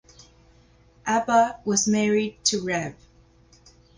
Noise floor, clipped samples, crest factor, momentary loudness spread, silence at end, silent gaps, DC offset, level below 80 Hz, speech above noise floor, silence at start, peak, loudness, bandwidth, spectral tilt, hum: -56 dBFS; under 0.1%; 18 dB; 8 LU; 1.05 s; none; under 0.1%; -58 dBFS; 33 dB; 1.05 s; -8 dBFS; -23 LUFS; 10.5 kHz; -3.5 dB/octave; 60 Hz at -55 dBFS